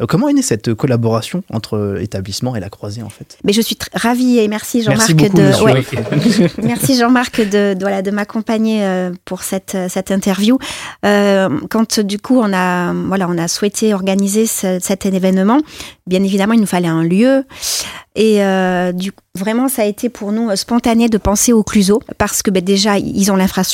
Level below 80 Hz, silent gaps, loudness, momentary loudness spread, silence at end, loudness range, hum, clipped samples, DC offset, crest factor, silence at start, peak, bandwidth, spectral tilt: -42 dBFS; none; -14 LUFS; 9 LU; 0 s; 5 LU; none; under 0.1%; under 0.1%; 14 dB; 0 s; 0 dBFS; 16.5 kHz; -5 dB/octave